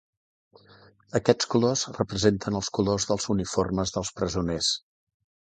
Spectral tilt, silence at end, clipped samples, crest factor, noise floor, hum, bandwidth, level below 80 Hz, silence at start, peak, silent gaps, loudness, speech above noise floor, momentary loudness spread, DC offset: -4.5 dB/octave; 0.8 s; under 0.1%; 24 dB; -55 dBFS; none; 9.6 kHz; -48 dBFS; 1.15 s; -4 dBFS; none; -26 LUFS; 30 dB; 6 LU; under 0.1%